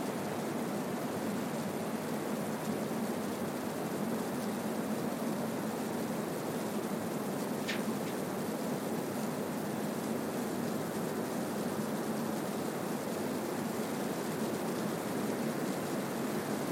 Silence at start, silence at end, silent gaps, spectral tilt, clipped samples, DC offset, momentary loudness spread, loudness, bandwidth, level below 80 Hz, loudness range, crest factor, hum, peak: 0 s; 0 s; none; -5 dB/octave; under 0.1%; under 0.1%; 1 LU; -36 LUFS; 16.5 kHz; -74 dBFS; 1 LU; 14 dB; none; -22 dBFS